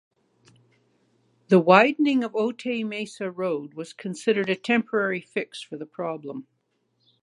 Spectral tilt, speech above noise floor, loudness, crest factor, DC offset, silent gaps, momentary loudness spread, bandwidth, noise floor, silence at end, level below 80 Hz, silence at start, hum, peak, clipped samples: -6 dB/octave; 48 dB; -24 LUFS; 24 dB; under 0.1%; none; 18 LU; 11.5 kHz; -72 dBFS; 0.8 s; -80 dBFS; 1.5 s; none; -2 dBFS; under 0.1%